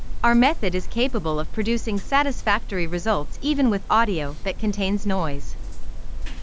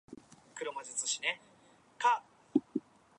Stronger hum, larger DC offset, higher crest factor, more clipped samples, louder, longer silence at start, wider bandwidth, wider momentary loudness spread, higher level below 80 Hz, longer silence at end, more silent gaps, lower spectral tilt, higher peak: neither; neither; second, 16 dB vs 24 dB; neither; first, -23 LUFS vs -35 LUFS; about the same, 0 s vs 0.1 s; second, 8 kHz vs 11 kHz; about the same, 16 LU vs 18 LU; first, -32 dBFS vs -82 dBFS; second, 0 s vs 0.4 s; neither; first, -5.5 dB/octave vs -1.5 dB/octave; first, -4 dBFS vs -14 dBFS